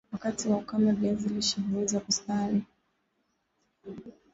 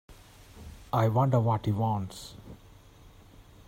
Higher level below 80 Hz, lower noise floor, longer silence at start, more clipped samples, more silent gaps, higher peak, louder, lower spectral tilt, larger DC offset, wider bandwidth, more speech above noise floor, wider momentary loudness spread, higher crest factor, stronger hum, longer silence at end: second, -62 dBFS vs -56 dBFS; first, -76 dBFS vs -54 dBFS; about the same, 0.1 s vs 0.1 s; neither; neither; about the same, -14 dBFS vs -12 dBFS; about the same, -29 LUFS vs -28 LUFS; second, -4.5 dB/octave vs -8 dB/octave; neither; second, 8 kHz vs 16 kHz; first, 48 dB vs 27 dB; second, 19 LU vs 24 LU; about the same, 18 dB vs 18 dB; neither; about the same, 0.25 s vs 0.25 s